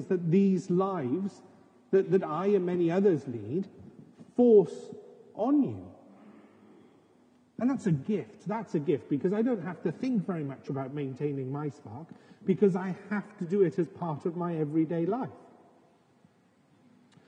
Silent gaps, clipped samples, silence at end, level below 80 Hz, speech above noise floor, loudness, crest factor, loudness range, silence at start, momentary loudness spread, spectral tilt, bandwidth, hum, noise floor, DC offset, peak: none; under 0.1%; 1.9 s; -82 dBFS; 36 dB; -29 LUFS; 18 dB; 6 LU; 0 s; 13 LU; -9 dB/octave; 9 kHz; none; -65 dBFS; under 0.1%; -12 dBFS